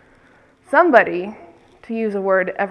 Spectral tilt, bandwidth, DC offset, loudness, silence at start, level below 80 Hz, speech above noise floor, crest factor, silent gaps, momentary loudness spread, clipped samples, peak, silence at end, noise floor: -7 dB/octave; 10.5 kHz; under 0.1%; -17 LUFS; 0.7 s; -62 dBFS; 36 dB; 20 dB; none; 15 LU; under 0.1%; 0 dBFS; 0 s; -52 dBFS